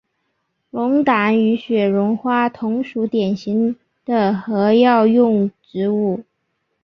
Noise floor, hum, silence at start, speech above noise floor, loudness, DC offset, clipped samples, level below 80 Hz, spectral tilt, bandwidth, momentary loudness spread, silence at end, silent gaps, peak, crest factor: -71 dBFS; none; 0.75 s; 55 dB; -17 LUFS; under 0.1%; under 0.1%; -62 dBFS; -8.5 dB/octave; 6.2 kHz; 10 LU; 0.6 s; none; -2 dBFS; 16 dB